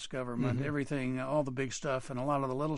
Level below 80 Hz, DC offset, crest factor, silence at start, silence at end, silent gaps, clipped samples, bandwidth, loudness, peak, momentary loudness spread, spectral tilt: -58 dBFS; under 0.1%; 14 dB; 0 s; 0 s; none; under 0.1%; 11.5 kHz; -34 LUFS; -18 dBFS; 3 LU; -6 dB/octave